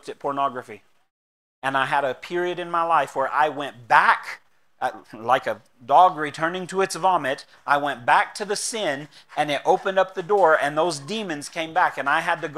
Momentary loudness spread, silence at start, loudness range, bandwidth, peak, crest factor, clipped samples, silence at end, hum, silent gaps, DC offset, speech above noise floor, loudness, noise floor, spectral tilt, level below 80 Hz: 12 LU; 0.05 s; 3 LU; 14.5 kHz; -2 dBFS; 22 dB; under 0.1%; 0 s; none; 1.11-1.62 s; 0.1%; over 68 dB; -22 LUFS; under -90 dBFS; -3.5 dB/octave; -72 dBFS